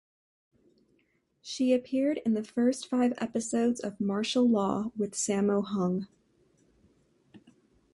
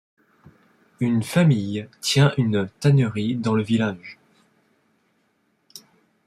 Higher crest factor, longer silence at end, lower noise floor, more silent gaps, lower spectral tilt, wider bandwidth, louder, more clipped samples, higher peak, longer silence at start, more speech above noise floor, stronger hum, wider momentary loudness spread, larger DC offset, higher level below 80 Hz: about the same, 16 dB vs 18 dB; about the same, 0.55 s vs 0.5 s; first, -72 dBFS vs -68 dBFS; neither; about the same, -5 dB/octave vs -6 dB/octave; second, 11.5 kHz vs 14.5 kHz; second, -29 LUFS vs -21 LUFS; neither; second, -14 dBFS vs -6 dBFS; first, 1.45 s vs 1 s; second, 43 dB vs 47 dB; neither; about the same, 7 LU vs 9 LU; neither; second, -70 dBFS vs -60 dBFS